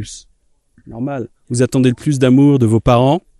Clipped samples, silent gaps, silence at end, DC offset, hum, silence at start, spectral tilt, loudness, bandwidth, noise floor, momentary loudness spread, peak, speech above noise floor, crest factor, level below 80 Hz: under 0.1%; none; 0.2 s; under 0.1%; none; 0 s; -7 dB/octave; -14 LUFS; 12.5 kHz; -55 dBFS; 15 LU; 0 dBFS; 41 dB; 14 dB; -36 dBFS